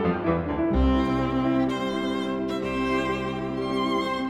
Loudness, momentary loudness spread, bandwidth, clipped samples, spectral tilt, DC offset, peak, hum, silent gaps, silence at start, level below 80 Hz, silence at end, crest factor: -25 LUFS; 5 LU; 11.5 kHz; under 0.1%; -7 dB/octave; under 0.1%; -10 dBFS; none; none; 0 s; -36 dBFS; 0 s; 14 dB